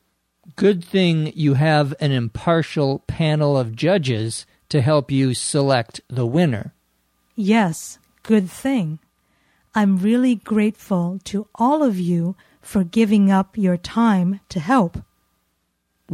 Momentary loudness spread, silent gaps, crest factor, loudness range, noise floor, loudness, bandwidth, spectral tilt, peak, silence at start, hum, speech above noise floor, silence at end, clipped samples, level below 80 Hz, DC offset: 10 LU; none; 16 dB; 3 LU; -70 dBFS; -19 LUFS; 14.5 kHz; -6.5 dB/octave; -4 dBFS; 0.5 s; none; 52 dB; 0 s; under 0.1%; -52 dBFS; under 0.1%